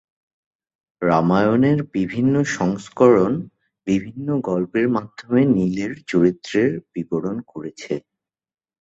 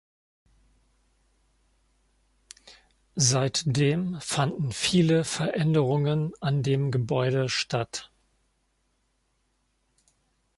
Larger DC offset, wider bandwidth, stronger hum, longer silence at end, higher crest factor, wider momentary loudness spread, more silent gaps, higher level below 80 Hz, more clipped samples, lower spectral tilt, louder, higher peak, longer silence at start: neither; second, 8 kHz vs 11.5 kHz; neither; second, 0.8 s vs 2.5 s; about the same, 18 dB vs 20 dB; first, 13 LU vs 7 LU; neither; first, -54 dBFS vs -60 dBFS; neither; first, -7 dB/octave vs -5 dB/octave; first, -20 LUFS vs -25 LUFS; first, -2 dBFS vs -8 dBFS; second, 1 s vs 2.65 s